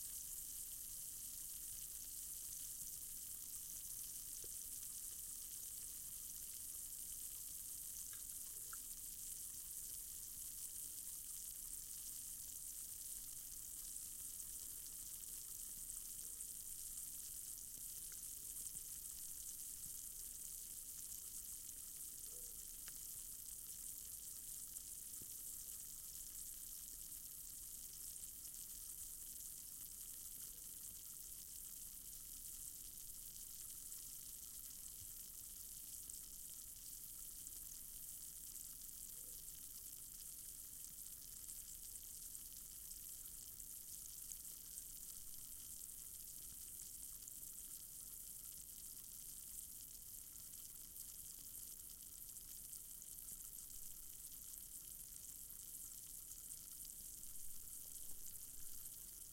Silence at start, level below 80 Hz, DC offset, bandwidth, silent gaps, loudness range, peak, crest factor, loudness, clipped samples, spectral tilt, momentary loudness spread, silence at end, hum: 0 s; -68 dBFS; under 0.1%; 17 kHz; none; 4 LU; -30 dBFS; 22 dB; -50 LUFS; under 0.1%; 0 dB/octave; 4 LU; 0 s; none